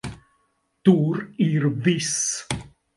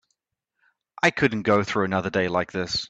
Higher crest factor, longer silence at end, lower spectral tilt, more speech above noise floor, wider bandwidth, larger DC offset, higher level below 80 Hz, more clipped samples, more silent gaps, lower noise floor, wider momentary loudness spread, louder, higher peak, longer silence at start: about the same, 20 dB vs 20 dB; first, 0.3 s vs 0.05 s; about the same, -5 dB/octave vs -5 dB/octave; second, 48 dB vs 57 dB; first, 11.5 kHz vs 8.6 kHz; neither; first, -52 dBFS vs -58 dBFS; neither; neither; second, -69 dBFS vs -80 dBFS; first, 12 LU vs 5 LU; about the same, -22 LUFS vs -23 LUFS; first, -2 dBFS vs -6 dBFS; second, 0.05 s vs 1.05 s